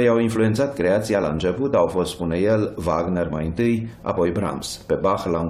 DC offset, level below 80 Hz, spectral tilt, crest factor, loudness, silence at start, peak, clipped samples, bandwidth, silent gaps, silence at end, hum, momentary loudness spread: under 0.1%; -44 dBFS; -6.5 dB/octave; 14 dB; -22 LUFS; 0 s; -6 dBFS; under 0.1%; 15.5 kHz; none; 0 s; none; 6 LU